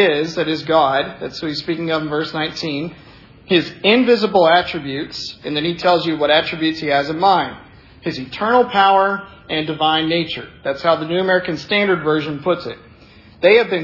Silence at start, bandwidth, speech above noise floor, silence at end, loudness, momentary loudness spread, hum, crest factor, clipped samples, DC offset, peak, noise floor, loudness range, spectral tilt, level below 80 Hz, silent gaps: 0 s; 6 kHz; 27 dB; 0 s; -17 LUFS; 12 LU; none; 18 dB; under 0.1%; under 0.1%; 0 dBFS; -44 dBFS; 3 LU; -5.5 dB/octave; -54 dBFS; none